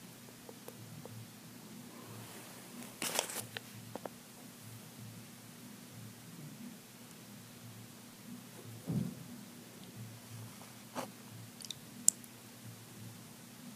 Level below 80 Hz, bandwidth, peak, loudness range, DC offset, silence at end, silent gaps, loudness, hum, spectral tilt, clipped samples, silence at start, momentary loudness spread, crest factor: -78 dBFS; 15.5 kHz; 0 dBFS; 12 LU; under 0.1%; 0 s; none; -44 LUFS; none; -3 dB/octave; under 0.1%; 0 s; 16 LU; 44 dB